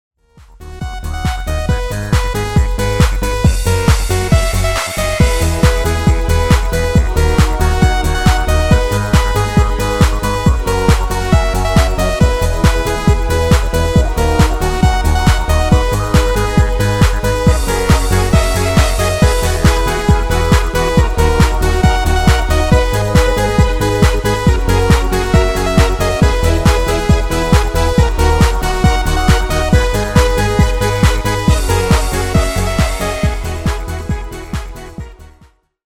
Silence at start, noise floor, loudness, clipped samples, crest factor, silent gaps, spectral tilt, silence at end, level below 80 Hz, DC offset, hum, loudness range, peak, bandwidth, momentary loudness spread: 0.6 s; -48 dBFS; -14 LUFS; under 0.1%; 12 dB; none; -5.5 dB/octave; 0.6 s; -16 dBFS; under 0.1%; none; 2 LU; 0 dBFS; 17 kHz; 4 LU